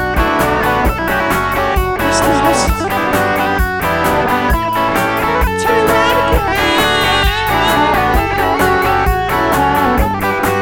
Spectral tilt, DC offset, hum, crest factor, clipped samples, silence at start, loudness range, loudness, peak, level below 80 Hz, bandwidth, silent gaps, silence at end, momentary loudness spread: -4.5 dB/octave; under 0.1%; none; 12 dB; under 0.1%; 0 s; 2 LU; -13 LUFS; 0 dBFS; -22 dBFS; 19 kHz; none; 0 s; 3 LU